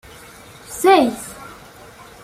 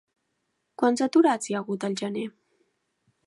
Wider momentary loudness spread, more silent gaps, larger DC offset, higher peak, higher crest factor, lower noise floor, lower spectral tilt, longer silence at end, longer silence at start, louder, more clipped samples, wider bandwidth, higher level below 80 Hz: first, 26 LU vs 12 LU; neither; neither; first, -2 dBFS vs -10 dBFS; about the same, 18 dB vs 18 dB; second, -42 dBFS vs -77 dBFS; second, -3.5 dB/octave vs -5 dB/octave; second, 0.7 s vs 1 s; about the same, 0.7 s vs 0.8 s; first, -15 LUFS vs -25 LUFS; neither; first, 16 kHz vs 11.5 kHz; first, -54 dBFS vs -80 dBFS